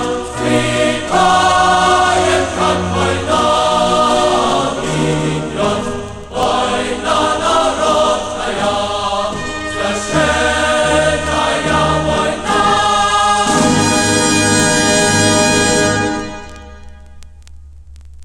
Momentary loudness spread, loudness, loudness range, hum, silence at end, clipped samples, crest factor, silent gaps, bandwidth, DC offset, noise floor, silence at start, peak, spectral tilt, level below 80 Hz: 8 LU; -13 LUFS; 4 LU; none; 0 s; under 0.1%; 14 dB; none; 15.5 kHz; under 0.1%; -35 dBFS; 0 s; 0 dBFS; -3.5 dB/octave; -34 dBFS